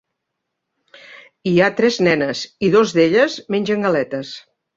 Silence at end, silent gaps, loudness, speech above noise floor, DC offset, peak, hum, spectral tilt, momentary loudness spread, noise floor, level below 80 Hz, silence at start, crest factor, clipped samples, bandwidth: 0.4 s; none; -17 LUFS; 61 dB; under 0.1%; -2 dBFS; none; -5.5 dB/octave; 12 LU; -78 dBFS; -58 dBFS; 1.1 s; 16 dB; under 0.1%; 7.8 kHz